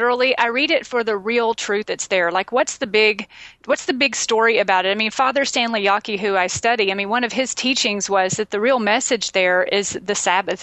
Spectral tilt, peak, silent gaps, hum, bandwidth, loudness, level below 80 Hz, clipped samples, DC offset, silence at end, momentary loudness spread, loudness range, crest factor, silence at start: -2 dB/octave; -2 dBFS; none; none; 9.4 kHz; -18 LUFS; -60 dBFS; under 0.1%; under 0.1%; 0 s; 5 LU; 1 LU; 16 dB; 0 s